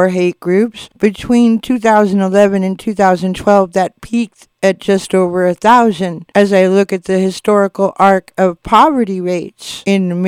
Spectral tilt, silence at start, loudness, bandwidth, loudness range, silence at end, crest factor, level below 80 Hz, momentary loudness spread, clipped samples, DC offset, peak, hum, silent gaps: -6 dB/octave; 0 s; -13 LUFS; 15 kHz; 1 LU; 0 s; 12 dB; -46 dBFS; 8 LU; 0.2%; under 0.1%; 0 dBFS; none; none